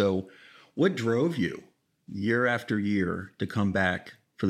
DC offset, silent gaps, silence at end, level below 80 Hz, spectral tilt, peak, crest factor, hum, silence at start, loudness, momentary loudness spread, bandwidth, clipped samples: under 0.1%; none; 0 s; -64 dBFS; -7 dB/octave; -10 dBFS; 20 dB; none; 0 s; -28 LUFS; 13 LU; 13 kHz; under 0.1%